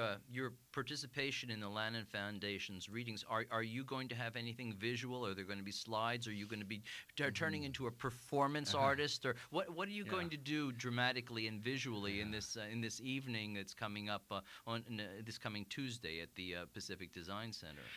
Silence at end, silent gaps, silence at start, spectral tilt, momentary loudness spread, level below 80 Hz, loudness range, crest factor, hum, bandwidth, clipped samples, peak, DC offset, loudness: 0 s; none; 0 s; -4.5 dB/octave; 9 LU; -70 dBFS; 6 LU; 22 dB; none; 16 kHz; under 0.1%; -22 dBFS; under 0.1%; -43 LUFS